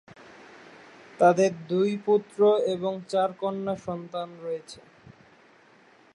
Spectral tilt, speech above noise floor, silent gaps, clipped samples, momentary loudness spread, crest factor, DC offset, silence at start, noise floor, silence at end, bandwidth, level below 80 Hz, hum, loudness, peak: -6 dB/octave; 32 dB; none; under 0.1%; 14 LU; 20 dB; under 0.1%; 1.2 s; -57 dBFS; 1.4 s; 10.5 kHz; -72 dBFS; none; -26 LUFS; -8 dBFS